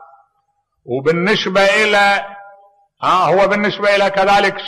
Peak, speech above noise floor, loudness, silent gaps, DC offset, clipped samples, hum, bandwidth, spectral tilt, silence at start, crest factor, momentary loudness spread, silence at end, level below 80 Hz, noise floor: -4 dBFS; 52 dB; -14 LUFS; none; under 0.1%; under 0.1%; none; 13.5 kHz; -4.5 dB/octave; 0 s; 12 dB; 8 LU; 0 s; -50 dBFS; -66 dBFS